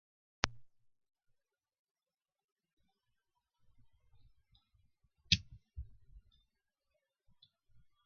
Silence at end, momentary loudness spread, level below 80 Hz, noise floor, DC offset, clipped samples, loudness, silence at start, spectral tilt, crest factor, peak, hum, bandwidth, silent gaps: 1.85 s; 22 LU; -60 dBFS; under -90 dBFS; under 0.1%; under 0.1%; -35 LUFS; 0.45 s; -1.5 dB/octave; 42 dB; -6 dBFS; none; 6 kHz; 1.79-1.85 s, 1.91-1.95 s, 2.44-2.56 s, 2.73-2.77 s